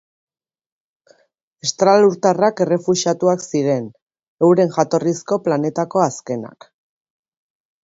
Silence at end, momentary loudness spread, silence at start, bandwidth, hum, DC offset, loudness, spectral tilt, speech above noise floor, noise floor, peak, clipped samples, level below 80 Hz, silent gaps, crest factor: 1.35 s; 11 LU; 1.65 s; 8 kHz; none; under 0.1%; -17 LUFS; -5.5 dB/octave; 46 dB; -63 dBFS; 0 dBFS; under 0.1%; -66 dBFS; 4.02-4.06 s, 4.28-4.37 s; 18 dB